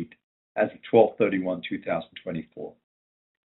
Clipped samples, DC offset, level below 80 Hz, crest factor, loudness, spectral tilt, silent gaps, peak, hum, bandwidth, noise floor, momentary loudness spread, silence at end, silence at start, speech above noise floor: under 0.1%; under 0.1%; -68 dBFS; 22 dB; -26 LUFS; -5 dB/octave; 0.23-0.55 s; -4 dBFS; none; 4.1 kHz; under -90 dBFS; 20 LU; 0.85 s; 0 s; over 65 dB